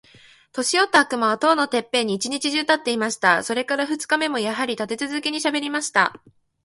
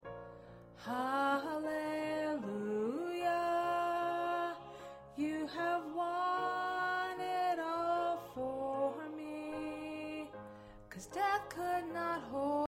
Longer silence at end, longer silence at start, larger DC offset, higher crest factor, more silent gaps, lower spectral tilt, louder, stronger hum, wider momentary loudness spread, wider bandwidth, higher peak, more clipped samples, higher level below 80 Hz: first, 0.45 s vs 0 s; first, 0.55 s vs 0 s; neither; about the same, 20 dB vs 16 dB; neither; second, -2 dB/octave vs -5 dB/octave; first, -21 LUFS vs -37 LUFS; neither; second, 7 LU vs 15 LU; second, 11.5 kHz vs 16 kHz; first, -2 dBFS vs -22 dBFS; neither; about the same, -68 dBFS vs -70 dBFS